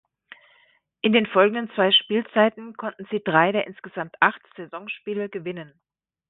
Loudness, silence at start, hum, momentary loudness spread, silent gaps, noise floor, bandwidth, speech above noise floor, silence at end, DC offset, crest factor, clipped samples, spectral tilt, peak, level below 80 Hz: -22 LUFS; 1.05 s; none; 16 LU; none; -62 dBFS; 4.1 kHz; 39 dB; 0.65 s; under 0.1%; 22 dB; under 0.1%; -9 dB/octave; -2 dBFS; -72 dBFS